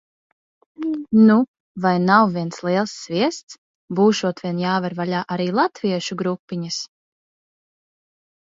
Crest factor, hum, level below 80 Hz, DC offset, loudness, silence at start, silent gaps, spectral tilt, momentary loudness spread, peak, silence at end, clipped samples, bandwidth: 20 dB; none; -66 dBFS; under 0.1%; -20 LUFS; 0.8 s; 1.48-1.54 s, 1.60-1.75 s, 3.43-3.48 s, 3.58-3.88 s, 6.39-6.48 s; -6 dB/octave; 13 LU; -2 dBFS; 1.6 s; under 0.1%; 7.8 kHz